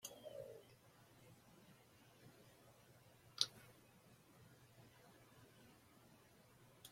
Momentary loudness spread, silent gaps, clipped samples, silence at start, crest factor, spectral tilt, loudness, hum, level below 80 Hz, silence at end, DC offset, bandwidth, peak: 22 LU; none; under 0.1%; 0 s; 42 dB; -1.5 dB/octave; -47 LUFS; none; -84 dBFS; 0 s; under 0.1%; 16.5 kHz; -14 dBFS